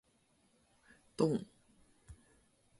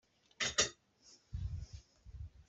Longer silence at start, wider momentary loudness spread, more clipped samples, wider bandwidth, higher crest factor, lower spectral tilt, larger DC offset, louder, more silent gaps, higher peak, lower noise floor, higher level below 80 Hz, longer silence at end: first, 1.2 s vs 0.4 s; first, 26 LU vs 22 LU; neither; first, 11.5 kHz vs 8.2 kHz; about the same, 26 dB vs 28 dB; first, -7 dB/octave vs -1.5 dB/octave; neither; about the same, -36 LUFS vs -37 LUFS; neither; about the same, -18 dBFS vs -16 dBFS; first, -73 dBFS vs -66 dBFS; second, -68 dBFS vs -54 dBFS; first, 0.65 s vs 0.05 s